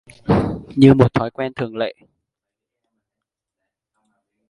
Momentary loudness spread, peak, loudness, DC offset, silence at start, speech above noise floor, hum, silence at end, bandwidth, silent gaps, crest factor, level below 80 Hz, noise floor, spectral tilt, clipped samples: 14 LU; 0 dBFS; -17 LUFS; under 0.1%; 0.3 s; 67 dB; none; 2.6 s; 11 kHz; none; 20 dB; -44 dBFS; -84 dBFS; -8.5 dB/octave; under 0.1%